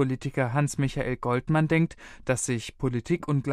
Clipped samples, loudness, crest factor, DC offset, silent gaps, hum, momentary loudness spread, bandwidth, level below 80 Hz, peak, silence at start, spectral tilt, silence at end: under 0.1%; -27 LUFS; 16 dB; under 0.1%; none; none; 6 LU; 13.5 kHz; -48 dBFS; -10 dBFS; 0 s; -6 dB/octave; 0 s